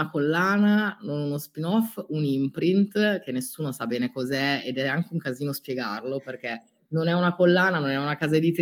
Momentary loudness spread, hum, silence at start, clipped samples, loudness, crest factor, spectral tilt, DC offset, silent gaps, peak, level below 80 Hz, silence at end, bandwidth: 10 LU; none; 0 s; under 0.1%; -25 LUFS; 16 dB; -6 dB/octave; under 0.1%; none; -8 dBFS; -72 dBFS; 0 s; 18.5 kHz